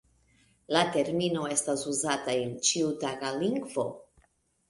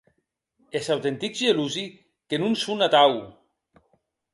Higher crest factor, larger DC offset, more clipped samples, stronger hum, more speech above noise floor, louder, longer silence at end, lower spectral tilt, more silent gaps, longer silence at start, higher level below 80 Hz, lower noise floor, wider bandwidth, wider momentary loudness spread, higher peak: about the same, 22 dB vs 20 dB; neither; neither; neither; second, 40 dB vs 51 dB; second, -29 LUFS vs -23 LUFS; second, 0.65 s vs 1.05 s; about the same, -3 dB/octave vs -4 dB/octave; neither; about the same, 0.7 s vs 0.75 s; about the same, -68 dBFS vs -70 dBFS; second, -69 dBFS vs -74 dBFS; about the same, 11.5 kHz vs 11.5 kHz; second, 7 LU vs 14 LU; second, -10 dBFS vs -6 dBFS